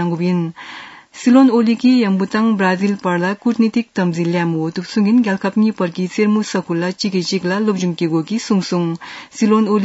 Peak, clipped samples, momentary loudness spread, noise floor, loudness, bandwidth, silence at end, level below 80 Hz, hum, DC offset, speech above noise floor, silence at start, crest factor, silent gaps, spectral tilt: -2 dBFS; under 0.1%; 8 LU; -35 dBFS; -16 LUFS; 8 kHz; 0 s; -66 dBFS; none; under 0.1%; 19 dB; 0 s; 14 dB; none; -6.5 dB/octave